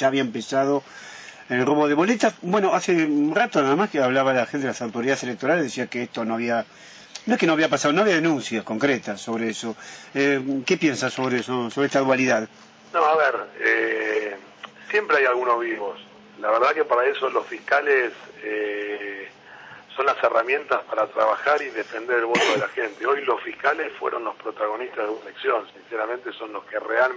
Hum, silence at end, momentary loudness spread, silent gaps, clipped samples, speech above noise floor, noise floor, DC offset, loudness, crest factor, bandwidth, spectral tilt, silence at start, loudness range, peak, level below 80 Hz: none; 0 s; 12 LU; none; under 0.1%; 21 dB; -44 dBFS; under 0.1%; -23 LUFS; 16 dB; 8 kHz; -4.5 dB/octave; 0 s; 4 LU; -6 dBFS; -72 dBFS